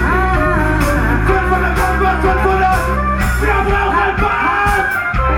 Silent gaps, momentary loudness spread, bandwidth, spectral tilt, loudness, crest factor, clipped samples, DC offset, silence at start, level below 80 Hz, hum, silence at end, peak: none; 2 LU; 18.5 kHz; -6 dB/octave; -14 LUFS; 12 dB; under 0.1%; under 0.1%; 0 s; -20 dBFS; none; 0 s; -2 dBFS